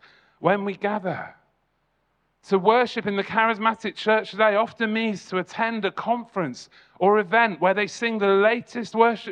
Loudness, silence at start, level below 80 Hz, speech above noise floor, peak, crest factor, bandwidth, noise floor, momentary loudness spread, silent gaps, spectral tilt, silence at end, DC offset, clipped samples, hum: -23 LUFS; 0.4 s; -72 dBFS; 48 dB; -4 dBFS; 20 dB; 9.4 kHz; -71 dBFS; 10 LU; none; -5.5 dB/octave; 0 s; under 0.1%; under 0.1%; none